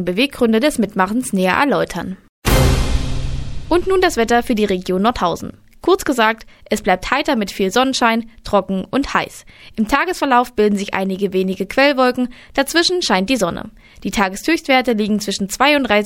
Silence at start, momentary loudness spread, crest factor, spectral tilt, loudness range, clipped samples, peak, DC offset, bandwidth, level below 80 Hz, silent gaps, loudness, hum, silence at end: 0 s; 9 LU; 16 dB; -4.5 dB/octave; 2 LU; under 0.1%; -2 dBFS; under 0.1%; 17 kHz; -30 dBFS; 2.29-2.42 s; -17 LUFS; none; 0 s